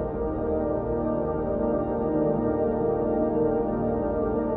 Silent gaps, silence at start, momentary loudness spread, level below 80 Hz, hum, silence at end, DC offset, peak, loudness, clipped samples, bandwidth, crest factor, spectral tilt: none; 0 s; 3 LU; -40 dBFS; none; 0 s; under 0.1%; -14 dBFS; -26 LUFS; under 0.1%; 3.1 kHz; 12 dB; -13 dB/octave